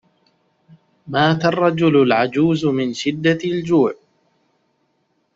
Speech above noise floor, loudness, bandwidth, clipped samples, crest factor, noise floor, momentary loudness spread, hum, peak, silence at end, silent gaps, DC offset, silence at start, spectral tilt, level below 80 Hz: 50 dB; -17 LUFS; 7.8 kHz; under 0.1%; 16 dB; -66 dBFS; 7 LU; none; -2 dBFS; 1.45 s; none; under 0.1%; 1.05 s; -6.5 dB/octave; -58 dBFS